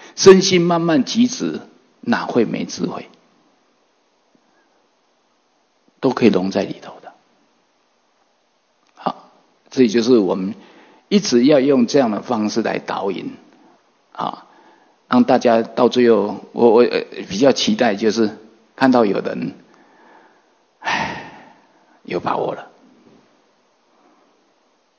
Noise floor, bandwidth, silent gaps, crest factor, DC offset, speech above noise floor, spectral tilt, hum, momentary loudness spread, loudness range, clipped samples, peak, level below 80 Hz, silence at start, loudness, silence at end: -63 dBFS; 7 kHz; none; 20 dB; under 0.1%; 47 dB; -5 dB/octave; none; 15 LU; 12 LU; 0.1%; 0 dBFS; -62 dBFS; 0 s; -17 LUFS; 2.35 s